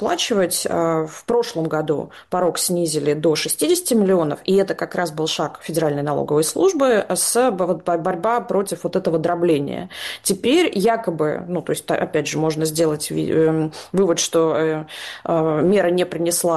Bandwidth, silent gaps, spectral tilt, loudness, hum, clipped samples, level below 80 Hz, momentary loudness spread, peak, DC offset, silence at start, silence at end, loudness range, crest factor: 12.5 kHz; none; -4.5 dB/octave; -20 LUFS; none; under 0.1%; -58 dBFS; 7 LU; -6 dBFS; under 0.1%; 0 s; 0 s; 1 LU; 12 dB